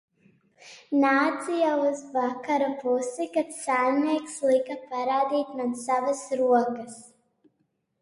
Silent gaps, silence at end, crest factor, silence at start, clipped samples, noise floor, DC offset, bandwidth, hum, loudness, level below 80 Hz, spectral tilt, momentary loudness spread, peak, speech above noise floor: none; 0.95 s; 16 dB; 0.65 s; under 0.1%; -74 dBFS; under 0.1%; 11.5 kHz; none; -26 LUFS; -76 dBFS; -3.5 dB/octave; 8 LU; -10 dBFS; 49 dB